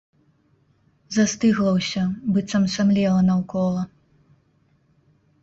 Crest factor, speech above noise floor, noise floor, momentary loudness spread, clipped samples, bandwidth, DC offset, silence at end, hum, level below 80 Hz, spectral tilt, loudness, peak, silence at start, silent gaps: 16 dB; 42 dB; -62 dBFS; 6 LU; under 0.1%; 8 kHz; under 0.1%; 1.55 s; none; -56 dBFS; -6 dB/octave; -21 LUFS; -8 dBFS; 1.1 s; none